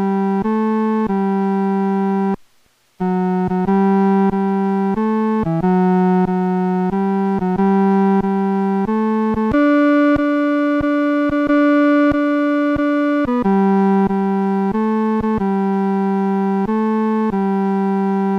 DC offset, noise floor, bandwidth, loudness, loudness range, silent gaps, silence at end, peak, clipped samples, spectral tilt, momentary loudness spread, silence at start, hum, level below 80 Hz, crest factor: under 0.1%; -57 dBFS; 5.8 kHz; -17 LUFS; 3 LU; none; 0 s; -6 dBFS; under 0.1%; -9.5 dB/octave; 4 LU; 0 s; none; -46 dBFS; 10 dB